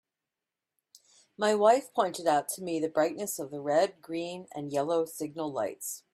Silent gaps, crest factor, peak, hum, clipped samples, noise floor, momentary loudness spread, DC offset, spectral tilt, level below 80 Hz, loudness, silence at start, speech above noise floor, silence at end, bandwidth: none; 20 dB; -10 dBFS; none; under 0.1%; -89 dBFS; 12 LU; under 0.1%; -4 dB/octave; -78 dBFS; -30 LUFS; 1.4 s; 60 dB; 0.15 s; 16 kHz